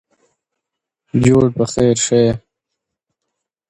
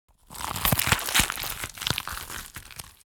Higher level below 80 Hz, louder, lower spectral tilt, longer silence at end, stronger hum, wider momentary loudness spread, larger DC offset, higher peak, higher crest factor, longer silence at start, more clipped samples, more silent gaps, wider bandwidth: about the same, -44 dBFS vs -44 dBFS; first, -15 LUFS vs -26 LUFS; first, -5.5 dB/octave vs -2 dB/octave; first, 1.3 s vs 0.2 s; neither; second, 7 LU vs 18 LU; neither; about the same, 0 dBFS vs -2 dBFS; second, 18 dB vs 26 dB; first, 1.15 s vs 0.3 s; neither; neither; second, 11.5 kHz vs over 20 kHz